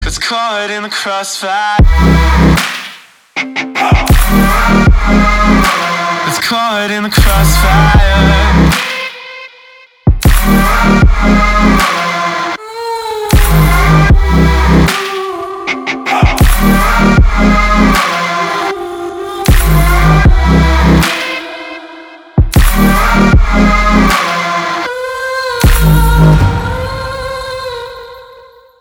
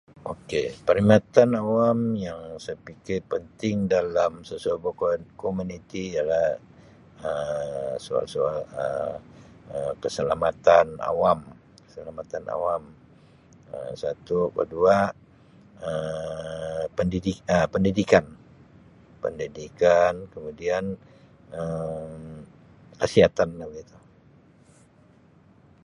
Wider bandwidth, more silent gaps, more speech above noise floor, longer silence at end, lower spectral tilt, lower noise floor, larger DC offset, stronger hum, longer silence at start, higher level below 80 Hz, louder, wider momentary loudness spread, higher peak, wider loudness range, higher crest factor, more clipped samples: first, 19.5 kHz vs 11 kHz; neither; about the same, 31 dB vs 32 dB; second, 0.55 s vs 2 s; about the same, -5.5 dB/octave vs -6.5 dB/octave; second, -39 dBFS vs -56 dBFS; neither; neither; second, 0 s vs 0.25 s; first, -14 dBFS vs -52 dBFS; first, -10 LUFS vs -25 LUFS; second, 11 LU vs 18 LU; about the same, 0 dBFS vs -2 dBFS; second, 2 LU vs 5 LU; second, 10 dB vs 24 dB; first, 0.4% vs under 0.1%